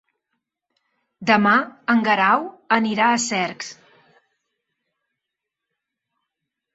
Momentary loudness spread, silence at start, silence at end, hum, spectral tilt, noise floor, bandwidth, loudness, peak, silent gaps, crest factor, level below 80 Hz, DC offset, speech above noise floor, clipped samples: 11 LU; 1.2 s; 3 s; none; -3.5 dB/octave; -83 dBFS; 8 kHz; -19 LUFS; -2 dBFS; none; 22 dB; -70 dBFS; under 0.1%; 64 dB; under 0.1%